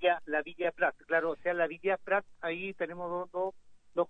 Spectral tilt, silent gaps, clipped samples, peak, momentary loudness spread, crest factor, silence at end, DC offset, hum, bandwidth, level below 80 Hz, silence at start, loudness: -6.5 dB/octave; none; under 0.1%; -16 dBFS; 8 LU; 18 dB; 0 s; under 0.1%; none; 4.5 kHz; -72 dBFS; 0 s; -33 LUFS